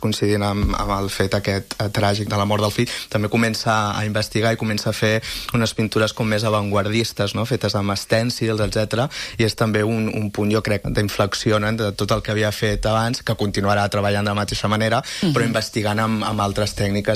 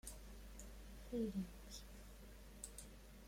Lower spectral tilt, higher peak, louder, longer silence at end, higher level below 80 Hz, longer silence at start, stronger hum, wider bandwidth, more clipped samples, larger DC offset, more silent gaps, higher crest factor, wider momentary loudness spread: about the same, -5 dB/octave vs -5 dB/octave; first, -4 dBFS vs -32 dBFS; first, -20 LUFS vs -52 LUFS; about the same, 0 s vs 0 s; first, -38 dBFS vs -58 dBFS; about the same, 0 s vs 0.05 s; neither; about the same, 15.5 kHz vs 16.5 kHz; neither; neither; neither; about the same, 16 dB vs 20 dB; second, 3 LU vs 15 LU